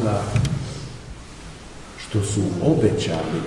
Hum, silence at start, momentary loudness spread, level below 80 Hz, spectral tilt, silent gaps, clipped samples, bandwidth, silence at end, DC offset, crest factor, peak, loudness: none; 0 s; 20 LU; -40 dBFS; -6 dB/octave; none; under 0.1%; 11.5 kHz; 0 s; under 0.1%; 18 dB; -6 dBFS; -22 LUFS